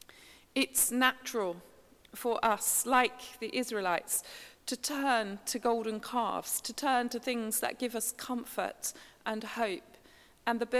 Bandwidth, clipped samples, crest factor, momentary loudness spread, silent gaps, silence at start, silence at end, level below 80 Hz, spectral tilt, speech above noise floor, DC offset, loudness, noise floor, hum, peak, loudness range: 16 kHz; under 0.1%; 24 dB; 11 LU; none; 0.2 s; 0 s; -70 dBFS; -1.5 dB/octave; 27 dB; under 0.1%; -32 LUFS; -60 dBFS; none; -10 dBFS; 4 LU